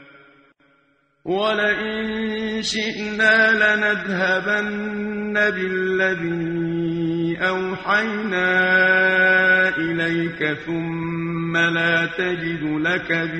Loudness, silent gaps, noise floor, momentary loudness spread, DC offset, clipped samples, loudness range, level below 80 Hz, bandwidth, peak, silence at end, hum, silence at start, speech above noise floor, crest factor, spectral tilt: -19 LUFS; none; -62 dBFS; 10 LU; under 0.1%; under 0.1%; 4 LU; -54 dBFS; 9.4 kHz; -4 dBFS; 0 s; none; 0 s; 42 dB; 16 dB; -5 dB/octave